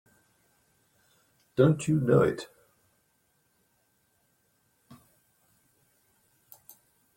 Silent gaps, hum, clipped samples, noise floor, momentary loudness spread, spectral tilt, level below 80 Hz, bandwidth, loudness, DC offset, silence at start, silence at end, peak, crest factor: none; none; under 0.1%; -72 dBFS; 28 LU; -7.5 dB/octave; -64 dBFS; 16.5 kHz; -26 LUFS; under 0.1%; 1.6 s; 4.7 s; -10 dBFS; 24 dB